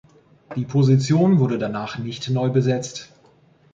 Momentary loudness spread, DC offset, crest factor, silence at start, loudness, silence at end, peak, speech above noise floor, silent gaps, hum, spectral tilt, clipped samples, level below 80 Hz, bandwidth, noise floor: 14 LU; under 0.1%; 16 dB; 0.5 s; -20 LUFS; 0.7 s; -6 dBFS; 35 dB; none; none; -7 dB/octave; under 0.1%; -60 dBFS; 7.6 kHz; -55 dBFS